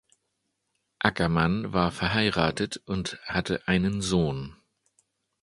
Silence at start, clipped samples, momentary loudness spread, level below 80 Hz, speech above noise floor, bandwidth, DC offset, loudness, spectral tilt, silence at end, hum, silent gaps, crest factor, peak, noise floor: 1 s; under 0.1%; 8 LU; -48 dBFS; 52 dB; 11.5 kHz; under 0.1%; -27 LUFS; -5.5 dB/octave; 0.9 s; none; none; 26 dB; -2 dBFS; -78 dBFS